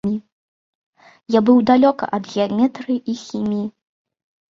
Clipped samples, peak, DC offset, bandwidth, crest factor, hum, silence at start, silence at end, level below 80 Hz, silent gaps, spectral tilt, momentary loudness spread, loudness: under 0.1%; -2 dBFS; under 0.1%; 7.2 kHz; 18 dB; none; 0.05 s; 0.85 s; -60 dBFS; 0.32-0.93 s; -7 dB/octave; 12 LU; -18 LUFS